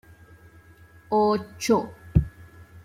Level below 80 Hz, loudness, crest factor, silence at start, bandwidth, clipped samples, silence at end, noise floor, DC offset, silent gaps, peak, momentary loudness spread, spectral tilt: -40 dBFS; -24 LUFS; 22 dB; 1.1 s; 16 kHz; under 0.1%; 0.05 s; -52 dBFS; under 0.1%; none; -4 dBFS; 5 LU; -6.5 dB/octave